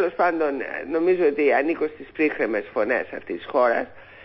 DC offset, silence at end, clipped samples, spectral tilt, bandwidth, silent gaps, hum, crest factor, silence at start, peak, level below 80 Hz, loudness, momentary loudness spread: under 0.1%; 0 s; under 0.1%; -9.5 dB/octave; 5.8 kHz; none; none; 14 dB; 0 s; -8 dBFS; -62 dBFS; -23 LUFS; 9 LU